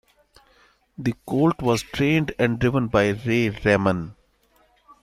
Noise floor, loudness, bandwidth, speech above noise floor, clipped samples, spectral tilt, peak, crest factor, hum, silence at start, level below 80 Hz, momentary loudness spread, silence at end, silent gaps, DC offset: -62 dBFS; -22 LUFS; 15 kHz; 40 dB; under 0.1%; -6.5 dB/octave; -4 dBFS; 20 dB; none; 1 s; -48 dBFS; 8 LU; 0.9 s; none; under 0.1%